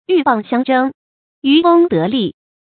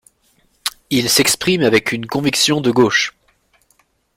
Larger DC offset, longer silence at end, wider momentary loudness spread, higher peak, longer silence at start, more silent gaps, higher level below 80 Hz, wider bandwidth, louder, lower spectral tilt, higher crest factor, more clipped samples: neither; second, 0.3 s vs 1.05 s; about the same, 11 LU vs 11 LU; about the same, 0 dBFS vs -2 dBFS; second, 0.1 s vs 0.65 s; first, 0.94-1.42 s vs none; second, -60 dBFS vs -52 dBFS; second, 4.5 kHz vs 16.5 kHz; about the same, -14 LUFS vs -15 LUFS; first, -11 dB/octave vs -3 dB/octave; about the same, 14 dB vs 16 dB; neither